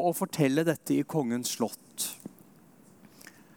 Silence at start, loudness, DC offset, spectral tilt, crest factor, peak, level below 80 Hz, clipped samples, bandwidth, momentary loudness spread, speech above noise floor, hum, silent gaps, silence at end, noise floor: 0 s; -30 LUFS; under 0.1%; -5 dB/octave; 20 dB; -12 dBFS; -78 dBFS; under 0.1%; 18 kHz; 24 LU; 28 dB; none; none; 1.3 s; -57 dBFS